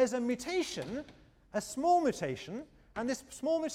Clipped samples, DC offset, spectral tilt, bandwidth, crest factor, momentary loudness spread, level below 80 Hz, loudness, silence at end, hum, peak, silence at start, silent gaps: under 0.1%; under 0.1%; -4.5 dB/octave; 16 kHz; 16 dB; 15 LU; -64 dBFS; -34 LUFS; 0 s; none; -18 dBFS; 0 s; none